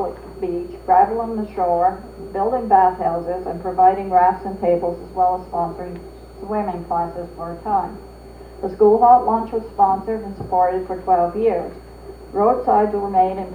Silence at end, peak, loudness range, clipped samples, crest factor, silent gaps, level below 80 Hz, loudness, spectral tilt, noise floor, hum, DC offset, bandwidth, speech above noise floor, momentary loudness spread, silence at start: 0 s; -2 dBFS; 6 LU; under 0.1%; 18 dB; none; -42 dBFS; -19 LUFS; -8 dB/octave; -39 dBFS; none; under 0.1%; 9.4 kHz; 20 dB; 15 LU; 0 s